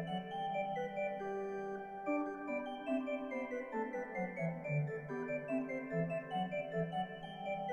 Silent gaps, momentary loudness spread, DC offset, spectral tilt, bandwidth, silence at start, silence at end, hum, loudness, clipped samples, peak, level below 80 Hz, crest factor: none; 3 LU; under 0.1%; -8 dB/octave; 9.4 kHz; 0 s; 0 s; none; -40 LUFS; under 0.1%; -26 dBFS; -72 dBFS; 14 dB